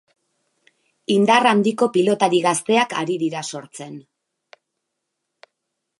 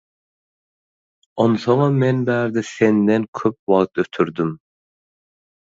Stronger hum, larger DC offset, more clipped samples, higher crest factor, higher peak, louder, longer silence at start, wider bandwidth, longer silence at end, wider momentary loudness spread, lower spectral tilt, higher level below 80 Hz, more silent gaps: neither; neither; neither; about the same, 20 dB vs 18 dB; about the same, 0 dBFS vs -2 dBFS; about the same, -18 LUFS vs -19 LUFS; second, 1.1 s vs 1.35 s; first, 11.5 kHz vs 7.8 kHz; first, 2 s vs 1.2 s; first, 21 LU vs 8 LU; second, -4.5 dB/octave vs -7.5 dB/octave; second, -74 dBFS vs -60 dBFS; second, none vs 3.28-3.33 s, 3.59-3.67 s